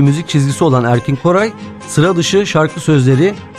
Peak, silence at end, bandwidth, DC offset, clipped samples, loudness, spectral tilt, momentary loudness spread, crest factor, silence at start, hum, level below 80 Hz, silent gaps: 0 dBFS; 0 s; 13 kHz; under 0.1%; under 0.1%; -13 LUFS; -6 dB/octave; 4 LU; 12 dB; 0 s; none; -46 dBFS; none